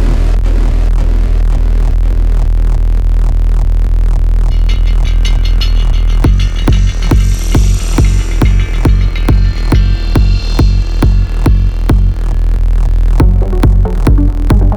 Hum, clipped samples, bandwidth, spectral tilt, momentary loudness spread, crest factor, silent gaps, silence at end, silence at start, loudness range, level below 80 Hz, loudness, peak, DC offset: none; under 0.1%; 9.2 kHz; -6.5 dB/octave; 3 LU; 8 dB; none; 0 s; 0 s; 2 LU; -8 dBFS; -12 LUFS; 0 dBFS; 0.6%